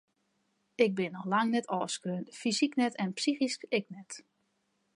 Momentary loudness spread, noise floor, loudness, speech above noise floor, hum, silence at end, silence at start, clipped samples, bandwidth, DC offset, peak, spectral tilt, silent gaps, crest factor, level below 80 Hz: 16 LU; -77 dBFS; -31 LUFS; 45 dB; none; 0.75 s; 0.8 s; under 0.1%; 11.5 kHz; under 0.1%; -12 dBFS; -4.5 dB/octave; none; 20 dB; -84 dBFS